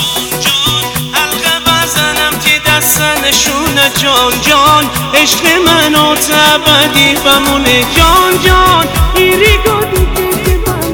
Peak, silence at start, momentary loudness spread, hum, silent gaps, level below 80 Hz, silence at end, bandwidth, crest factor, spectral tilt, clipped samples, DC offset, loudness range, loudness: 0 dBFS; 0 s; 6 LU; none; none; -20 dBFS; 0 s; over 20 kHz; 8 dB; -2.5 dB/octave; 2%; 0.3%; 2 LU; -8 LUFS